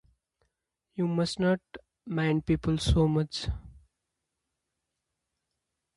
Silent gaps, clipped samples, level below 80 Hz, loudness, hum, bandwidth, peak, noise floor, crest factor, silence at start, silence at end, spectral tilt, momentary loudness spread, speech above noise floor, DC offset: none; under 0.1%; -42 dBFS; -29 LUFS; none; 11.5 kHz; -12 dBFS; -84 dBFS; 18 dB; 0.95 s; 2.2 s; -6.5 dB/octave; 13 LU; 57 dB; under 0.1%